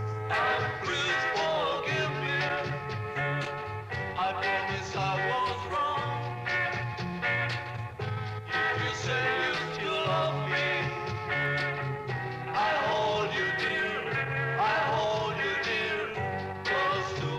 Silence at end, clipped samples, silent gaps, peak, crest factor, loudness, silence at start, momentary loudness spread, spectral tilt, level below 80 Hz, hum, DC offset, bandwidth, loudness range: 0 s; under 0.1%; none; -16 dBFS; 14 dB; -29 LUFS; 0 s; 7 LU; -5 dB/octave; -58 dBFS; none; under 0.1%; 13.5 kHz; 2 LU